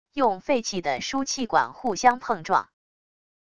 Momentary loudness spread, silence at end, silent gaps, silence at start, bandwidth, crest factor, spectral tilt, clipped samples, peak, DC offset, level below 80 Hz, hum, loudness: 6 LU; 0.7 s; none; 0.15 s; 11 kHz; 20 dB; -3 dB/octave; under 0.1%; -4 dBFS; 0.4%; -60 dBFS; none; -25 LUFS